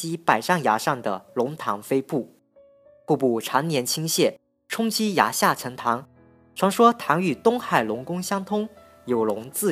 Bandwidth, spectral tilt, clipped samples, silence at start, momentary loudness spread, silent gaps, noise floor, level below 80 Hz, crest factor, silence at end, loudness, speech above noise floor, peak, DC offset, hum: 15.5 kHz; -4 dB/octave; under 0.1%; 0 s; 9 LU; none; -55 dBFS; -72 dBFS; 22 dB; 0 s; -23 LUFS; 33 dB; -2 dBFS; under 0.1%; none